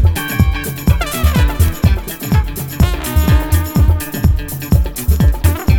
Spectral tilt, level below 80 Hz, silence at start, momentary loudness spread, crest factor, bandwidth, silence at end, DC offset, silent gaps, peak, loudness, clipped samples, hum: -6 dB/octave; -16 dBFS; 0 s; 3 LU; 12 dB; 19.5 kHz; 0 s; under 0.1%; none; 0 dBFS; -15 LUFS; under 0.1%; none